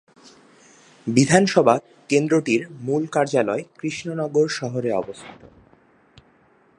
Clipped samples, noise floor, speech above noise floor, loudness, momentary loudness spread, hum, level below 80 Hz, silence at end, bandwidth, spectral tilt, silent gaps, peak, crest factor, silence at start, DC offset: under 0.1%; -57 dBFS; 37 dB; -21 LUFS; 13 LU; none; -62 dBFS; 1.45 s; 11.5 kHz; -5.5 dB/octave; none; 0 dBFS; 22 dB; 1.05 s; under 0.1%